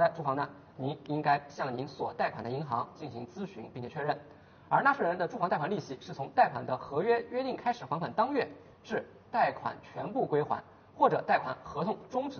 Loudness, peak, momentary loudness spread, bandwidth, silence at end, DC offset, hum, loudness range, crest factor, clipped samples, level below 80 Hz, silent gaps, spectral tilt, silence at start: -32 LUFS; -10 dBFS; 13 LU; 6.8 kHz; 0 s; under 0.1%; none; 4 LU; 22 dB; under 0.1%; -70 dBFS; none; -4.5 dB/octave; 0 s